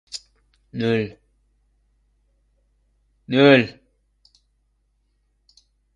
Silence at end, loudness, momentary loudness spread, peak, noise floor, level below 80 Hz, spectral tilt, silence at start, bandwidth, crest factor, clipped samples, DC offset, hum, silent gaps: 2.25 s; -19 LUFS; 22 LU; 0 dBFS; -67 dBFS; -60 dBFS; -6 dB/octave; 0.15 s; 11 kHz; 24 dB; under 0.1%; under 0.1%; 50 Hz at -60 dBFS; none